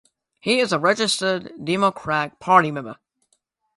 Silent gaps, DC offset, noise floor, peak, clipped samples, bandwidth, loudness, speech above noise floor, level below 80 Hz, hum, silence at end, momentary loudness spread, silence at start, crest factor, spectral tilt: none; under 0.1%; -69 dBFS; -2 dBFS; under 0.1%; 11.5 kHz; -20 LUFS; 48 dB; -64 dBFS; none; 0.85 s; 11 LU; 0.45 s; 20 dB; -4 dB/octave